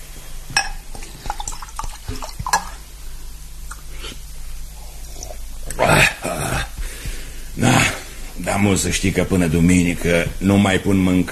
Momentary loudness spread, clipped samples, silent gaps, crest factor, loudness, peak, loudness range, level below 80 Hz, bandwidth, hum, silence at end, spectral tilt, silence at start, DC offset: 22 LU; under 0.1%; none; 20 dB; -18 LUFS; 0 dBFS; 12 LU; -30 dBFS; 13 kHz; none; 0 s; -4.5 dB/octave; 0 s; under 0.1%